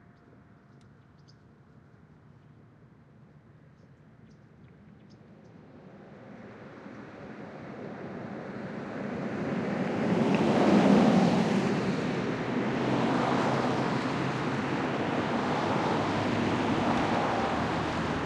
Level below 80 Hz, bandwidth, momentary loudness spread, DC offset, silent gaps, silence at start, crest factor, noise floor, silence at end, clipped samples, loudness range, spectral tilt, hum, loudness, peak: -60 dBFS; 10.5 kHz; 22 LU; under 0.1%; none; 2.8 s; 20 dB; -56 dBFS; 0 s; under 0.1%; 20 LU; -6.5 dB/octave; none; -28 LUFS; -10 dBFS